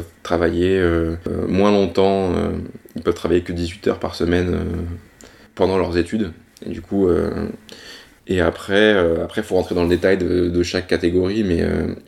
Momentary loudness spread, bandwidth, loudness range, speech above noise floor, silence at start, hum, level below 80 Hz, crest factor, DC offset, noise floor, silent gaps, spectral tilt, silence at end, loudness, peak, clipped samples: 13 LU; 14 kHz; 4 LU; 27 dB; 0 s; none; -40 dBFS; 20 dB; under 0.1%; -46 dBFS; none; -6.5 dB/octave; 0.1 s; -19 LUFS; 0 dBFS; under 0.1%